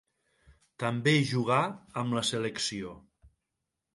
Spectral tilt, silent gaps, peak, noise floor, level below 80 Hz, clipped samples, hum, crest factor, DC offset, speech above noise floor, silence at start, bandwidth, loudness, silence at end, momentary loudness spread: -4.5 dB/octave; none; -12 dBFS; -85 dBFS; -66 dBFS; under 0.1%; none; 20 dB; under 0.1%; 56 dB; 0.8 s; 11.5 kHz; -29 LUFS; 0.7 s; 10 LU